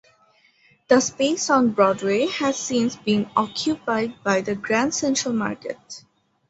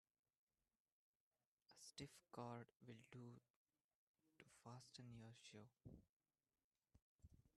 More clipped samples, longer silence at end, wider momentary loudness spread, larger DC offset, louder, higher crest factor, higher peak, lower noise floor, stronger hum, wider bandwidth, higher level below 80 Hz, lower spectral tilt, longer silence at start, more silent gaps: neither; first, 0.5 s vs 0.1 s; about the same, 9 LU vs 9 LU; neither; first, -22 LUFS vs -62 LUFS; about the same, 20 dB vs 24 dB; first, -2 dBFS vs -40 dBFS; second, -59 dBFS vs under -90 dBFS; neither; second, 8.2 kHz vs 12.5 kHz; first, -62 dBFS vs -84 dBFS; second, -3.5 dB/octave vs -5 dB/octave; second, 0.9 s vs 1.7 s; second, none vs 3.50-3.65 s, 3.84-3.89 s, 3.95-4.14 s, 6.09-6.20 s, 6.64-6.71 s, 7.02-7.19 s